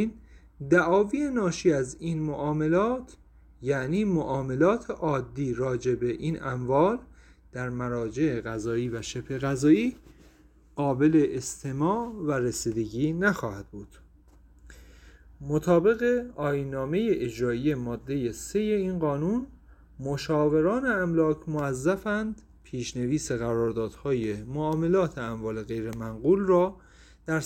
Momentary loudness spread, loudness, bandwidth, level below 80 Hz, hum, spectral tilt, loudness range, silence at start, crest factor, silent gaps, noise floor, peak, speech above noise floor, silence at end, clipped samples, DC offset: 11 LU; -27 LUFS; 16 kHz; -52 dBFS; none; -6.5 dB/octave; 3 LU; 0 s; 18 dB; none; -56 dBFS; -10 dBFS; 30 dB; 0 s; under 0.1%; under 0.1%